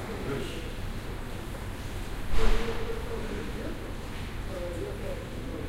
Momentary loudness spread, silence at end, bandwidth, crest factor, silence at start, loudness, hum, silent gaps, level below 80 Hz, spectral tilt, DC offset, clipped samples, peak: 7 LU; 0 s; 15.5 kHz; 20 dB; 0 s; -36 LUFS; none; none; -34 dBFS; -5.5 dB/octave; under 0.1%; under 0.1%; -8 dBFS